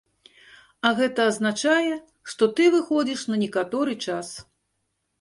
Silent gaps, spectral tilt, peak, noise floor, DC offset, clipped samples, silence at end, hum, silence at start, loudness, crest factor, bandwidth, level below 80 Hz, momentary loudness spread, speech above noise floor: none; -4 dB/octave; -6 dBFS; -75 dBFS; under 0.1%; under 0.1%; 0.8 s; none; 0.85 s; -23 LUFS; 18 dB; 11.5 kHz; -68 dBFS; 13 LU; 53 dB